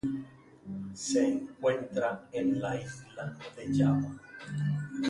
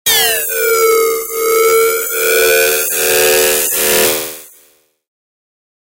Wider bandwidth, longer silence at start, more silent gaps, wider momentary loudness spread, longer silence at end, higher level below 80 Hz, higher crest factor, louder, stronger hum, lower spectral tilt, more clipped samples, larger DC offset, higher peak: second, 11.5 kHz vs 16.5 kHz; about the same, 0.05 s vs 0.05 s; neither; first, 14 LU vs 5 LU; second, 0 s vs 1.55 s; second, -62 dBFS vs -48 dBFS; first, 18 dB vs 12 dB; second, -32 LUFS vs -11 LUFS; neither; first, -6 dB/octave vs 0 dB/octave; neither; neither; second, -14 dBFS vs 0 dBFS